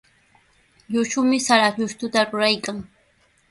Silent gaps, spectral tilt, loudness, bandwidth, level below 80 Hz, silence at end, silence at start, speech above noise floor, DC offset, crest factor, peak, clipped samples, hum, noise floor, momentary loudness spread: none; -3 dB/octave; -20 LUFS; 11.5 kHz; -62 dBFS; 0.65 s; 0.9 s; 41 dB; under 0.1%; 20 dB; -4 dBFS; under 0.1%; none; -61 dBFS; 10 LU